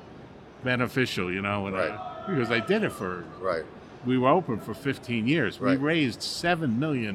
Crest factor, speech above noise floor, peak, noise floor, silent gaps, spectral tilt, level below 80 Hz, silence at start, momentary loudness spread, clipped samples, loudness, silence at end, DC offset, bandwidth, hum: 18 dB; 20 dB; -10 dBFS; -46 dBFS; none; -6 dB/octave; -60 dBFS; 0 s; 10 LU; under 0.1%; -27 LUFS; 0 s; under 0.1%; 14.5 kHz; none